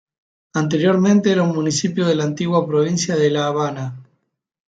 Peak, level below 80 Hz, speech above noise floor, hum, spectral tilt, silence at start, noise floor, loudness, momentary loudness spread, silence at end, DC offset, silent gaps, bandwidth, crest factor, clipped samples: -4 dBFS; -62 dBFS; 52 dB; none; -5.5 dB/octave; 0.55 s; -69 dBFS; -18 LUFS; 9 LU; 0.65 s; under 0.1%; none; 9.4 kHz; 16 dB; under 0.1%